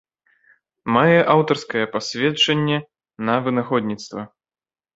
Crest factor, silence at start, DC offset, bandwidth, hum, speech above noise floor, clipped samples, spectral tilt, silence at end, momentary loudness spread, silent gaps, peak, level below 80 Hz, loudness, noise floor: 20 dB; 0.85 s; under 0.1%; 8 kHz; none; over 71 dB; under 0.1%; -5.5 dB/octave; 0.7 s; 16 LU; none; -2 dBFS; -60 dBFS; -19 LUFS; under -90 dBFS